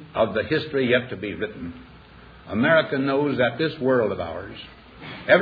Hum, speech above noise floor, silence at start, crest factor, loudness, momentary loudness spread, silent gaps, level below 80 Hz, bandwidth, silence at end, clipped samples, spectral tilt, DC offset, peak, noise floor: none; 24 dB; 0 s; 22 dB; -23 LUFS; 19 LU; none; -54 dBFS; 5 kHz; 0 s; under 0.1%; -8.5 dB/octave; under 0.1%; -2 dBFS; -47 dBFS